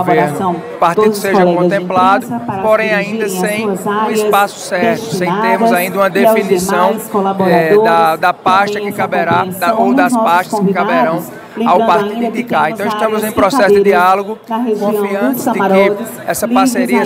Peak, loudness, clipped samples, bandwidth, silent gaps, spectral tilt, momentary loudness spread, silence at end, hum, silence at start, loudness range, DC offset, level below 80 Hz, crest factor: 0 dBFS; -12 LUFS; under 0.1%; 16 kHz; none; -5 dB/octave; 7 LU; 0 s; none; 0 s; 2 LU; under 0.1%; -54 dBFS; 12 dB